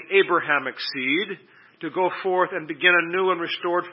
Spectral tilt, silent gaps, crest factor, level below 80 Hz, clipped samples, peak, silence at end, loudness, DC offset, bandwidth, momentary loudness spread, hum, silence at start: -8 dB/octave; none; 20 dB; -84 dBFS; under 0.1%; -4 dBFS; 0 s; -22 LUFS; under 0.1%; 5.8 kHz; 12 LU; none; 0 s